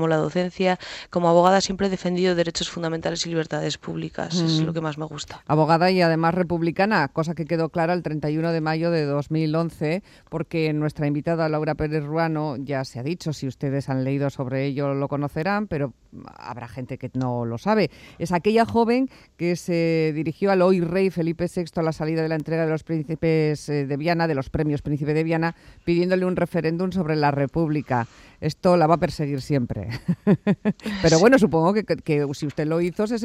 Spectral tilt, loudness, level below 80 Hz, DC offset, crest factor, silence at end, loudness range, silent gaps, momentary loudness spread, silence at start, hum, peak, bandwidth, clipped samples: -6.5 dB/octave; -23 LUFS; -50 dBFS; under 0.1%; 20 dB; 0 s; 5 LU; none; 10 LU; 0 s; none; -2 dBFS; 12.5 kHz; under 0.1%